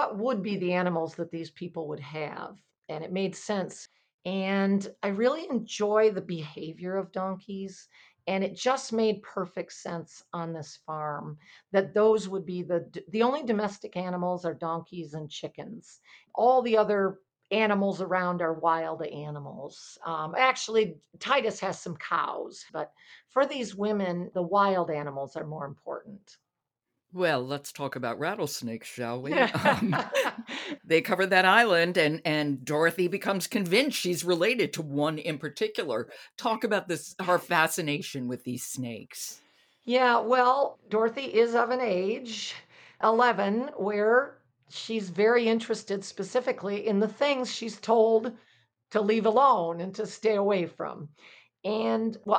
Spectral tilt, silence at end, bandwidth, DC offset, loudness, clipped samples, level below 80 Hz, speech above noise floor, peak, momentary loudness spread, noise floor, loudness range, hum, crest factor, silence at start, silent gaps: -4.5 dB/octave; 0 s; 19 kHz; under 0.1%; -28 LUFS; under 0.1%; -76 dBFS; 58 dB; -8 dBFS; 15 LU; -86 dBFS; 7 LU; none; 20 dB; 0 s; 2.78-2.82 s, 4.14-4.19 s